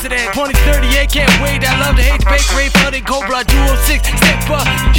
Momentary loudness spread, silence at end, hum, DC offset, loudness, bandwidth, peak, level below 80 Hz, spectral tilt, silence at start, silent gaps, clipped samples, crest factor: 4 LU; 0 s; none; under 0.1%; -12 LUFS; 17 kHz; 0 dBFS; -14 dBFS; -4 dB/octave; 0 s; none; under 0.1%; 12 dB